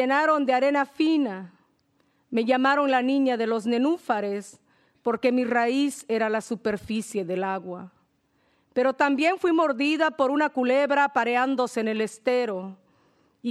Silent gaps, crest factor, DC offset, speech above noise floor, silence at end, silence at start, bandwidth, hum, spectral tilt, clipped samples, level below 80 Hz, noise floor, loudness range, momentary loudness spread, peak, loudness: none; 16 dB; under 0.1%; 44 dB; 0 s; 0 s; 13 kHz; none; -4.5 dB/octave; under 0.1%; -70 dBFS; -68 dBFS; 4 LU; 9 LU; -8 dBFS; -24 LUFS